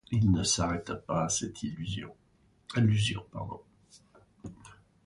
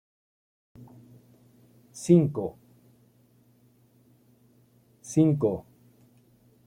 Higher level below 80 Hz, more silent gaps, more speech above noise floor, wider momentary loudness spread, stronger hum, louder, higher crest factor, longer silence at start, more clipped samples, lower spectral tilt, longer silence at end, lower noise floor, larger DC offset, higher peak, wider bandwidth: first, -50 dBFS vs -66 dBFS; neither; second, 30 dB vs 39 dB; about the same, 22 LU vs 20 LU; neither; second, -30 LUFS vs -25 LUFS; second, 18 dB vs 24 dB; second, 0.1 s vs 0.8 s; neither; second, -4.5 dB/octave vs -8 dB/octave; second, 0.3 s vs 1.05 s; about the same, -60 dBFS vs -62 dBFS; neither; second, -14 dBFS vs -8 dBFS; second, 11.5 kHz vs 14 kHz